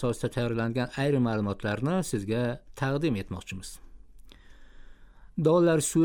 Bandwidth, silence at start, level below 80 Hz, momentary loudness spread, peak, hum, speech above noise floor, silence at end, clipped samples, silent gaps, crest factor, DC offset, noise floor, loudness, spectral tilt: 17.5 kHz; 0 s; -50 dBFS; 15 LU; -12 dBFS; none; 22 dB; 0 s; under 0.1%; none; 16 dB; under 0.1%; -49 dBFS; -28 LUFS; -6 dB/octave